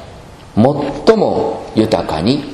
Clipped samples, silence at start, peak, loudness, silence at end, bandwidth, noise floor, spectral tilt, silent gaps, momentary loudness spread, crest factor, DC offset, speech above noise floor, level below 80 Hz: 0.2%; 0 s; 0 dBFS; -15 LUFS; 0 s; 13 kHz; -35 dBFS; -7 dB/octave; none; 6 LU; 14 dB; under 0.1%; 22 dB; -40 dBFS